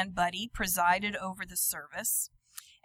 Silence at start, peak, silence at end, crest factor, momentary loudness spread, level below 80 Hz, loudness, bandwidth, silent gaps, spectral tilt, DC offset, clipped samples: 0 s; -14 dBFS; 0.25 s; 20 dB; 11 LU; -54 dBFS; -30 LUFS; 16.5 kHz; none; -2 dB/octave; under 0.1%; under 0.1%